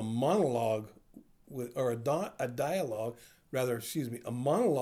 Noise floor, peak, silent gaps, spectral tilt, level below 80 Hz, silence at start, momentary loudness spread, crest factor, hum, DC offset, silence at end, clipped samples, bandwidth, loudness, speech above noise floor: -58 dBFS; -18 dBFS; none; -6 dB/octave; -70 dBFS; 0 s; 11 LU; 16 dB; none; under 0.1%; 0 s; under 0.1%; over 20 kHz; -33 LUFS; 26 dB